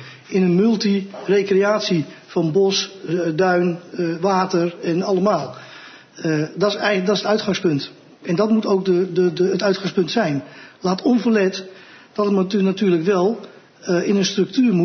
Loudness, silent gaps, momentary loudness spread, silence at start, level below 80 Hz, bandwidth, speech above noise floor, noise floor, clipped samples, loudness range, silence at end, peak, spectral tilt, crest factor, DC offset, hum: -19 LUFS; none; 9 LU; 0 s; -66 dBFS; 6.6 kHz; 23 dB; -41 dBFS; under 0.1%; 2 LU; 0 s; -4 dBFS; -6 dB/octave; 14 dB; under 0.1%; none